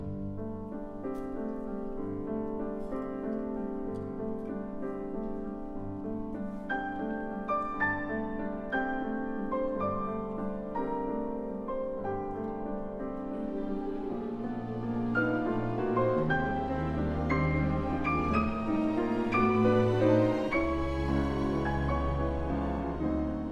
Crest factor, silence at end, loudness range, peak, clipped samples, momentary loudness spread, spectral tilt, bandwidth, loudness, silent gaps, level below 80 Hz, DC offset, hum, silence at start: 18 dB; 0 s; 9 LU; -14 dBFS; under 0.1%; 10 LU; -8.5 dB/octave; 9.2 kHz; -32 LUFS; none; -42 dBFS; under 0.1%; none; 0 s